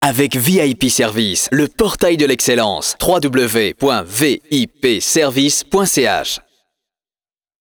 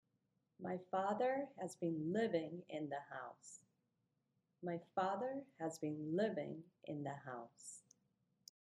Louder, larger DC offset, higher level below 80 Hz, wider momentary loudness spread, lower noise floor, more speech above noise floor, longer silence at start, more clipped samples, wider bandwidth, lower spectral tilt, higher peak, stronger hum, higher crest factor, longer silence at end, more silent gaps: first, -14 LUFS vs -44 LUFS; neither; first, -42 dBFS vs -90 dBFS; second, 4 LU vs 16 LU; first, under -90 dBFS vs -86 dBFS; first, over 75 dB vs 42 dB; second, 0 s vs 0.6 s; neither; first, over 20 kHz vs 11.5 kHz; second, -3.5 dB/octave vs -6 dB/octave; first, -2 dBFS vs -26 dBFS; neither; second, 14 dB vs 20 dB; first, 1.2 s vs 0.85 s; neither